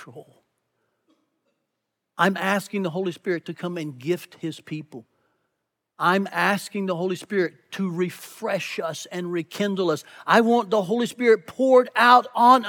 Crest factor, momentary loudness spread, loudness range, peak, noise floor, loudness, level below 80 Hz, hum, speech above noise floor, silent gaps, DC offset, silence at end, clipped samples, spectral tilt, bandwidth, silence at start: 22 dB; 15 LU; 8 LU; -2 dBFS; -80 dBFS; -23 LUFS; -84 dBFS; none; 58 dB; none; under 0.1%; 0 s; under 0.1%; -5 dB/octave; 19 kHz; 0 s